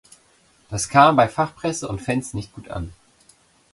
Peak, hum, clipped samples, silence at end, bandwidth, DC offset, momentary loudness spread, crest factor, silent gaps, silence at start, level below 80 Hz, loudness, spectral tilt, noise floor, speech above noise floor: 0 dBFS; none; under 0.1%; 0.85 s; 11.5 kHz; under 0.1%; 18 LU; 22 dB; none; 0.7 s; -46 dBFS; -20 LUFS; -5 dB/octave; -58 dBFS; 38 dB